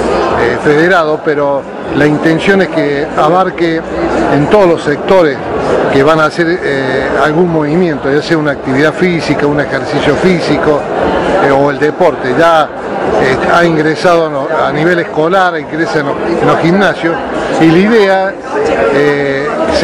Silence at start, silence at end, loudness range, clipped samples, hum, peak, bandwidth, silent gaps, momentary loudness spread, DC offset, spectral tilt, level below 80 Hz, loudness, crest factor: 0 s; 0 s; 1 LU; 2%; none; 0 dBFS; 11.5 kHz; none; 5 LU; under 0.1%; -6 dB/octave; -36 dBFS; -10 LUFS; 10 dB